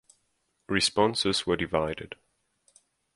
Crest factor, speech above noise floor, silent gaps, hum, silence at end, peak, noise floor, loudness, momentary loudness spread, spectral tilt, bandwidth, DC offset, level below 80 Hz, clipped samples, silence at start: 22 dB; 48 dB; none; none; 1 s; -8 dBFS; -75 dBFS; -26 LUFS; 17 LU; -3.5 dB/octave; 11.5 kHz; under 0.1%; -54 dBFS; under 0.1%; 0.7 s